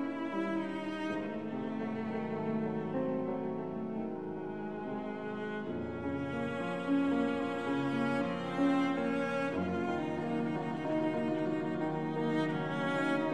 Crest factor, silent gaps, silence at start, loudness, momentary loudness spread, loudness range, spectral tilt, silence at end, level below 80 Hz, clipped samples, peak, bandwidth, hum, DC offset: 14 dB; none; 0 s; -35 LUFS; 7 LU; 5 LU; -7.5 dB/octave; 0 s; -68 dBFS; under 0.1%; -20 dBFS; 10 kHz; none; 0.1%